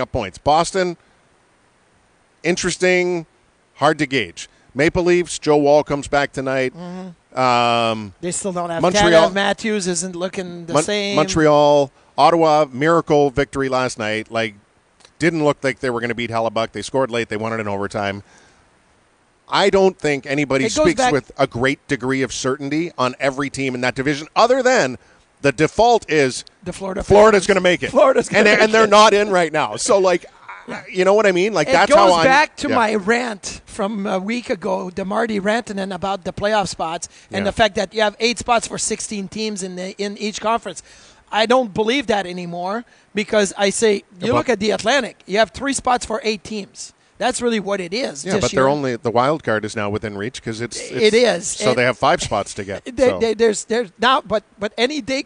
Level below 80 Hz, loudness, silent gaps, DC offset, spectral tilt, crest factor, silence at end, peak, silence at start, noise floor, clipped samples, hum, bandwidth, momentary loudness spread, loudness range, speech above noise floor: -46 dBFS; -18 LUFS; none; under 0.1%; -4 dB/octave; 16 dB; 0.05 s; -2 dBFS; 0 s; -58 dBFS; under 0.1%; none; 10.5 kHz; 13 LU; 7 LU; 40 dB